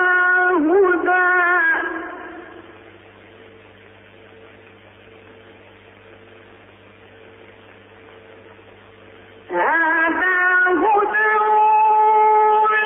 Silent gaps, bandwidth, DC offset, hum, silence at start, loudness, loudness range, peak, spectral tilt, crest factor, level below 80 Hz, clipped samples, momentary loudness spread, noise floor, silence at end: none; 3.7 kHz; under 0.1%; none; 0 s; -15 LUFS; 15 LU; -6 dBFS; -7.5 dB/octave; 14 dB; -60 dBFS; under 0.1%; 12 LU; -46 dBFS; 0 s